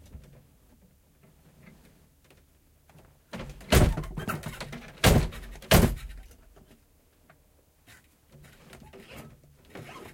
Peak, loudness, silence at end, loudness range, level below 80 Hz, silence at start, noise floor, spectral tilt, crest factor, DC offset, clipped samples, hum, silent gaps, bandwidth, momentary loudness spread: -6 dBFS; -26 LUFS; 0.05 s; 5 LU; -36 dBFS; 0.15 s; -63 dBFS; -5 dB/octave; 26 dB; under 0.1%; under 0.1%; none; none; 16.5 kHz; 28 LU